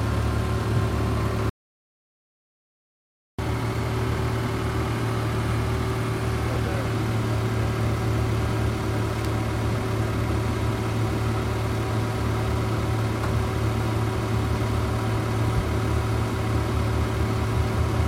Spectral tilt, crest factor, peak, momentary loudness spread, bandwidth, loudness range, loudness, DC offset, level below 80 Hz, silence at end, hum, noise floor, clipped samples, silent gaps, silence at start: -6.5 dB/octave; 14 dB; -12 dBFS; 2 LU; 16 kHz; 4 LU; -25 LUFS; under 0.1%; -34 dBFS; 0 s; none; under -90 dBFS; under 0.1%; 1.50-3.38 s; 0 s